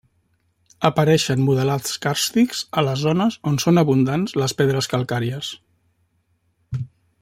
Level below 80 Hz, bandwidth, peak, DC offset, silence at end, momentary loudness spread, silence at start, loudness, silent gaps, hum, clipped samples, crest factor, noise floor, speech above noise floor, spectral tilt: -56 dBFS; 16.5 kHz; 0 dBFS; under 0.1%; 0.35 s; 14 LU; 0.8 s; -20 LUFS; none; none; under 0.1%; 20 dB; -66 dBFS; 47 dB; -5.5 dB/octave